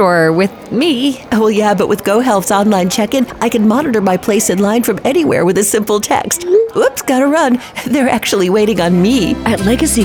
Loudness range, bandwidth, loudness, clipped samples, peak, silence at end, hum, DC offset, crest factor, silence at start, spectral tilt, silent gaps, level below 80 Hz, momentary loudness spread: 0 LU; over 20 kHz; -12 LUFS; under 0.1%; 0 dBFS; 0 s; none; under 0.1%; 12 dB; 0 s; -4.5 dB/octave; none; -38 dBFS; 3 LU